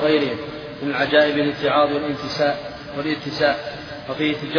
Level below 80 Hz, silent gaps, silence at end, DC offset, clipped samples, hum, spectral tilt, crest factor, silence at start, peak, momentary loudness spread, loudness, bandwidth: -52 dBFS; none; 0 s; under 0.1%; under 0.1%; none; -6 dB/octave; 20 dB; 0 s; -2 dBFS; 14 LU; -21 LUFS; 5.4 kHz